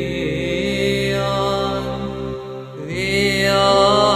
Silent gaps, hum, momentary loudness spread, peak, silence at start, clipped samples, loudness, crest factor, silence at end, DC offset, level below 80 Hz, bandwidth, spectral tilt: none; none; 14 LU; 0 dBFS; 0 s; under 0.1%; -18 LUFS; 18 dB; 0 s; under 0.1%; -38 dBFS; 14 kHz; -4.5 dB/octave